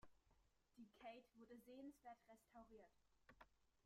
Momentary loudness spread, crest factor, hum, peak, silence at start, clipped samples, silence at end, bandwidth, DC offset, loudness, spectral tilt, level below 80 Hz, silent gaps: 7 LU; 18 dB; none; -48 dBFS; 0 s; under 0.1%; 0 s; 14.5 kHz; under 0.1%; -64 LUFS; -5 dB/octave; -84 dBFS; none